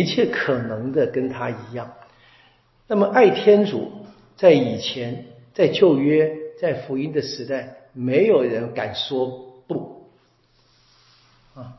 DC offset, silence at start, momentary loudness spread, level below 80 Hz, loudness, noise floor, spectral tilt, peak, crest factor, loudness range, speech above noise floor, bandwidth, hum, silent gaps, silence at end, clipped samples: under 0.1%; 0 s; 17 LU; -62 dBFS; -20 LUFS; -60 dBFS; -6.5 dB/octave; -2 dBFS; 20 dB; 5 LU; 41 dB; 6 kHz; none; none; 0.05 s; under 0.1%